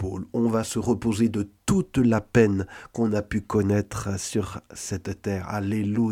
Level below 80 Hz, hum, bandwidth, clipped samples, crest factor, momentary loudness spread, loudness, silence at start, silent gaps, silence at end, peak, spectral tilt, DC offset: -48 dBFS; none; 15.5 kHz; under 0.1%; 18 dB; 10 LU; -25 LUFS; 0 s; none; 0 s; -6 dBFS; -6.5 dB/octave; under 0.1%